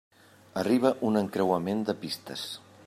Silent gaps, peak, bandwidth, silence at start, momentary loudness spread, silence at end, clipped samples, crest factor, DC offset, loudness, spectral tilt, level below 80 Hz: none; -10 dBFS; 15 kHz; 0.55 s; 12 LU; 0.3 s; under 0.1%; 20 dB; under 0.1%; -29 LUFS; -6 dB/octave; -72 dBFS